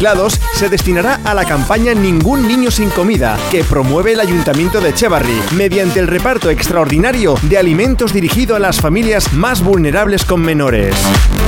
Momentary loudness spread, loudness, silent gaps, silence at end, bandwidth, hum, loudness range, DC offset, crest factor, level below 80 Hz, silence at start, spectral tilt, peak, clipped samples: 2 LU; -12 LUFS; none; 0 s; 18 kHz; none; 1 LU; 0.4%; 10 dB; -20 dBFS; 0 s; -5 dB/octave; 0 dBFS; under 0.1%